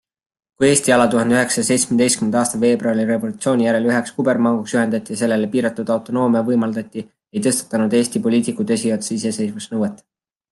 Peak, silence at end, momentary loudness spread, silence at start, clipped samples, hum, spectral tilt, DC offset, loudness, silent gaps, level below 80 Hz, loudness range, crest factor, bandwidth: 0 dBFS; 0.55 s; 8 LU; 0.6 s; under 0.1%; none; -4.5 dB/octave; under 0.1%; -18 LUFS; none; -60 dBFS; 4 LU; 18 dB; 12.5 kHz